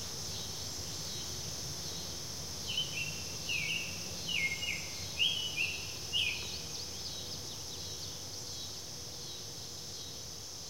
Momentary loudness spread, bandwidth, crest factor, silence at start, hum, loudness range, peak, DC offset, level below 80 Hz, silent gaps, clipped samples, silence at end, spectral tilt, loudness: 10 LU; 16 kHz; 20 dB; 0 s; none; 7 LU; -20 dBFS; 0.3%; -58 dBFS; none; under 0.1%; 0 s; -1 dB/octave; -36 LUFS